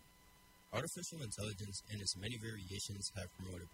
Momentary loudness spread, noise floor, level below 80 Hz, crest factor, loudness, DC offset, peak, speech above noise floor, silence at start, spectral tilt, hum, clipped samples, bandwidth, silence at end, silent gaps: 6 LU; -66 dBFS; -66 dBFS; 22 dB; -44 LUFS; under 0.1%; -24 dBFS; 20 dB; 0 s; -3.5 dB/octave; none; under 0.1%; 16 kHz; 0 s; none